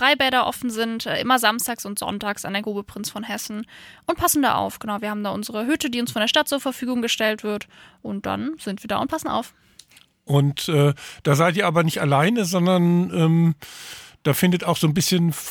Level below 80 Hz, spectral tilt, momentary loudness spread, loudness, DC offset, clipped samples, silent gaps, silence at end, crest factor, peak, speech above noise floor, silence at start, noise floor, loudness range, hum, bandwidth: -56 dBFS; -4.5 dB/octave; 12 LU; -22 LUFS; under 0.1%; under 0.1%; none; 0 s; 20 dB; -2 dBFS; 30 dB; 0 s; -52 dBFS; 6 LU; none; over 20 kHz